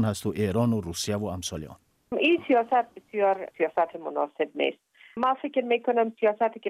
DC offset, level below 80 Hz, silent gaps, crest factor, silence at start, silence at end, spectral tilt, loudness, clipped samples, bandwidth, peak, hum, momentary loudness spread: under 0.1%; -60 dBFS; none; 16 dB; 0 s; 0 s; -5.5 dB/octave; -27 LUFS; under 0.1%; 15.5 kHz; -12 dBFS; none; 10 LU